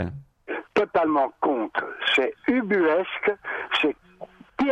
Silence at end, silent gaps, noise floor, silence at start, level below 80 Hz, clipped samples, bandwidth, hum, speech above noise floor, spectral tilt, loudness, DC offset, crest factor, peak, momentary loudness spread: 0 s; none; -45 dBFS; 0 s; -58 dBFS; under 0.1%; 9 kHz; none; 21 dB; -5.5 dB/octave; -24 LUFS; under 0.1%; 16 dB; -8 dBFS; 13 LU